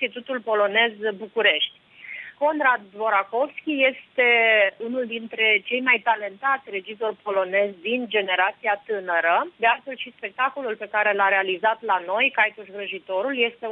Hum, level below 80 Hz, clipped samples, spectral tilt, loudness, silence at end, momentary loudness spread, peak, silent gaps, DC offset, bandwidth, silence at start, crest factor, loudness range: none; -78 dBFS; under 0.1%; -6 dB/octave; -22 LUFS; 0 s; 11 LU; -6 dBFS; none; under 0.1%; 4.8 kHz; 0 s; 18 dB; 3 LU